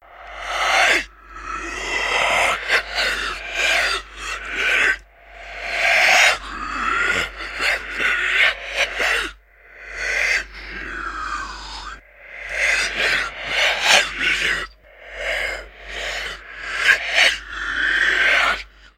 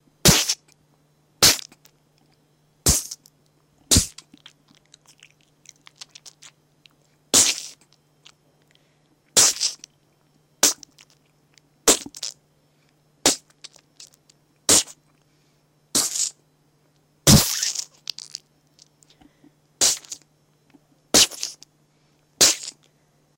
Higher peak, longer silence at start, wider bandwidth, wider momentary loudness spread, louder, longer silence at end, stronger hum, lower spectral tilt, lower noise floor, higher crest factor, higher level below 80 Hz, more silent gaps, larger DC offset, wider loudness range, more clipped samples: about the same, 0 dBFS vs -2 dBFS; second, 0.1 s vs 0.25 s; about the same, 16 kHz vs 17 kHz; second, 17 LU vs 21 LU; about the same, -18 LUFS vs -19 LUFS; second, 0.1 s vs 0.65 s; neither; about the same, -0.5 dB/octave vs -1.5 dB/octave; second, -46 dBFS vs -62 dBFS; about the same, 20 dB vs 24 dB; about the same, -42 dBFS vs -44 dBFS; neither; neither; about the same, 5 LU vs 5 LU; neither